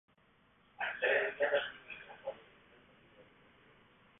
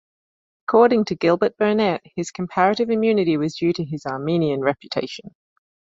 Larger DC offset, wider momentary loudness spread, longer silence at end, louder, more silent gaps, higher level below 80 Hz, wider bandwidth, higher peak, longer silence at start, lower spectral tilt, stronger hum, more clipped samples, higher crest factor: neither; first, 17 LU vs 11 LU; first, 0.95 s vs 0.55 s; second, -36 LUFS vs -20 LUFS; neither; second, -78 dBFS vs -60 dBFS; second, 3.9 kHz vs 7.8 kHz; second, -20 dBFS vs -2 dBFS; about the same, 0.8 s vs 0.7 s; second, 4 dB/octave vs -6.5 dB/octave; neither; neither; about the same, 20 dB vs 18 dB